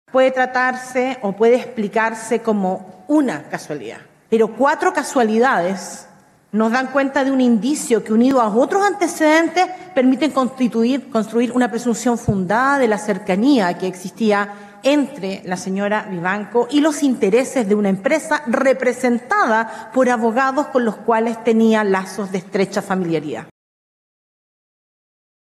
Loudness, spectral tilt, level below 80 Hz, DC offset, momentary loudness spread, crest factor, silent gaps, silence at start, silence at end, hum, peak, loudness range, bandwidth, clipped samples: -18 LUFS; -5 dB/octave; -56 dBFS; under 0.1%; 8 LU; 14 dB; none; 0.15 s; 1.95 s; none; -4 dBFS; 4 LU; 13 kHz; under 0.1%